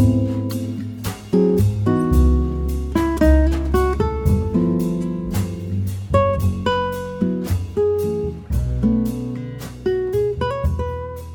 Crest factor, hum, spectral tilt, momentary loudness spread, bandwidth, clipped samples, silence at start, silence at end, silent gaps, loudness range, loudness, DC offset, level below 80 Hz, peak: 16 dB; none; -8 dB/octave; 9 LU; 19 kHz; under 0.1%; 0 s; 0 s; none; 4 LU; -20 LUFS; under 0.1%; -24 dBFS; -2 dBFS